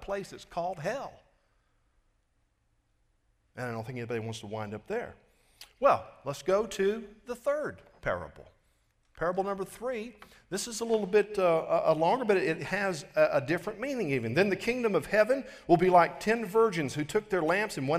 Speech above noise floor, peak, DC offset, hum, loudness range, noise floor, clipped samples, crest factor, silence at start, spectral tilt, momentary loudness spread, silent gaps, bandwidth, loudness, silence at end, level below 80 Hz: 44 dB; -10 dBFS; under 0.1%; none; 14 LU; -73 dBFS; under 0.1%; 20 dB; 0 s; -5.5 dB/octave; 12 LU; none; 15.5 kHz; -30 LUFS; 0 s; -60 dBFS